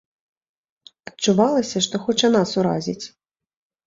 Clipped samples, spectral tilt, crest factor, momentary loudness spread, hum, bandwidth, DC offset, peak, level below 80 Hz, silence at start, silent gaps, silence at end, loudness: under 0.1%; -4.5 dB/octave; 18 dB; 18 LU; none; 7.8 kHz; under 0.1%; -4 dBFS; -62 dBFS; 1.05 s; none; 0.8 s; -20 LUFS